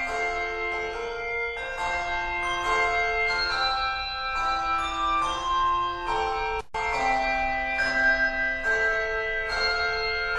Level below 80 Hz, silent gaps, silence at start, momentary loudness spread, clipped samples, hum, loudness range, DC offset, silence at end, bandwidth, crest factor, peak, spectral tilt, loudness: -42 dBFS; none; 0 s; 6 LU; under 0.1%; none; 2 LU; under 0.1%; 0 s; 12.5 kHz; 14 dB; -12 dBFS; -2.5 dB/octave; -25 LUFS